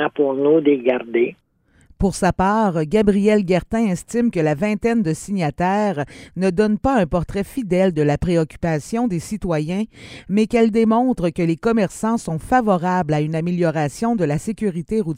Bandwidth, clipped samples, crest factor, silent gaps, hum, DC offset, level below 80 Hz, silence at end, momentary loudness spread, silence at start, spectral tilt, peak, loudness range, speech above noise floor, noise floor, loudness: 15.5 kHz; under 0.1%; 16 dB; none; none; under 0.1%; -40 dBFS; 0 s; 7 LU; 0 s; -7 dB/octave; -2 dBFS; 2 LU; 36 dB; -54 dBFS; -19 LUFS